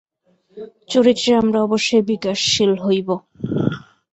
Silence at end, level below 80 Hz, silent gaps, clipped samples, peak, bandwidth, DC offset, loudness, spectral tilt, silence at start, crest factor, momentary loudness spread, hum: 0.35 s; -54 dBFS; none; under 0.1%; -2 dBFS; 8.2 kHz; under 0.1%; -18 LUFS; -4.5 dB/octave; 0.55 s; 16 dB; 15 LU; none